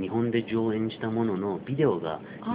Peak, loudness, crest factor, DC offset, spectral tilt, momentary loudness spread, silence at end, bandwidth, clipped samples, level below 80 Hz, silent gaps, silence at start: -12 dBFS; -28 LUFS; 16 dB; under 0.1%; -6.5 dB/octave; 6 LU; 0 s; 4.9 kHz; under 0.1%; -64 dBFS; none; 0 s